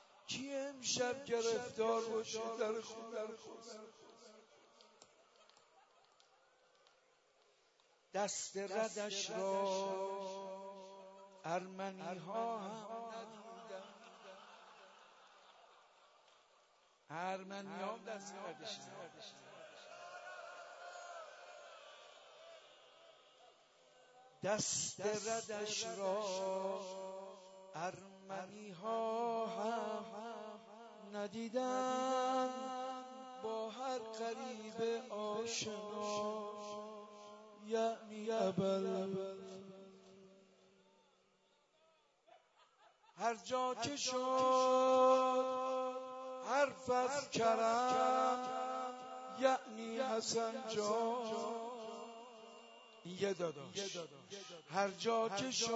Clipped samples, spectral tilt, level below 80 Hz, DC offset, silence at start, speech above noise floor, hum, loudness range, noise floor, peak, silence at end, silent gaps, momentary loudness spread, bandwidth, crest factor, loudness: under 0.1%; -2.5 dB/octave; -88 dBFS; under 0.1%; 0 s; 36 dB; none; 18 LU; -75 dBFS; -20 dBFS; 0 s; none; 20 LU; 7.6 kHz; 22 dB; -40 LUFS